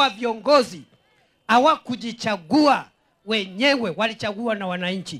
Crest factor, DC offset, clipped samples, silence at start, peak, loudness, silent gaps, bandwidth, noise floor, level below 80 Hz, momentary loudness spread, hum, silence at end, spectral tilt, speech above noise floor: 18 dB; under 0.1%; under 0.1%; 0 s; -4 dBFS; -21 LUFS; none; 14 kHz; -62 dBFS; -66 dBFS; 9 LU; none; 0 s; -4.5 dB/octave; 41 dB